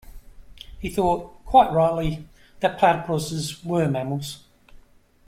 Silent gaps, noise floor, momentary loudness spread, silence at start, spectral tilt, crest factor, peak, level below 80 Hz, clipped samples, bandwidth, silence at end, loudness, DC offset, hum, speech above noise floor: none; -52 dBFS; 14 LU; 0.05 s; -6 dB/octave; 20 dB; -4 dBFS; -44 dBFS; under 0.1%; 16 kHz; 0.9 s; -22 LUFS; under 0.1%; none; 31 dB